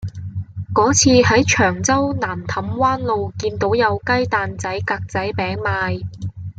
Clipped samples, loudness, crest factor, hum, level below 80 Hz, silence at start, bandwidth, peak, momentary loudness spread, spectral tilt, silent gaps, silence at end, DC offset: under 0.1%; -18 LUFS; 16 dB; none; -46 dBFS; 0 s; 9.4 kHz; -2 dBFS; 13 LU; -4 dB/octave; none; 0.05 s; under 0.1%